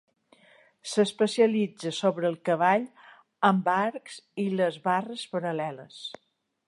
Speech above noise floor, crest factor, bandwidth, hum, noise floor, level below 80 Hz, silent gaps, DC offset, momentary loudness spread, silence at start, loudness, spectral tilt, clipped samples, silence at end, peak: 33 dB; 20 dB; 11.5 kHz; none; -60 dBFS; -80 dBFS; none; under 0.1%; 16 LU; 0.85 s; -27 LUFS; -5.5 dB/octave; under 0.1%; 0.55 s; -8 dBFS